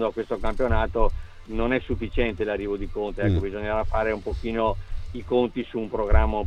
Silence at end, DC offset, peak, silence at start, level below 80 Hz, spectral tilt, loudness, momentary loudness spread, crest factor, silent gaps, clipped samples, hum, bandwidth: 0 s; under 0.1%; -4 dBFS; 0 s; -28 dBFS; -8 dB/octave; -26 LUFS; 6 LU; 20 dB; none; under 0.1%; none; 5.8 kHz